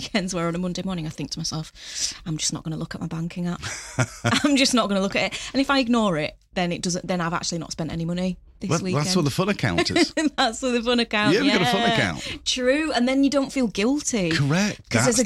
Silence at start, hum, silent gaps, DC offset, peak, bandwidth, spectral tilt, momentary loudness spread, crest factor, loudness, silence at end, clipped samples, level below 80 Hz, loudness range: 0 s; none; none; under 0.1%; -4 dBFS; 15 kHz; -4 dB/octave; 10 LU; 18 dB; -23 LUFS; 0 s; under 0.1%; -48 dBFS; 6 LU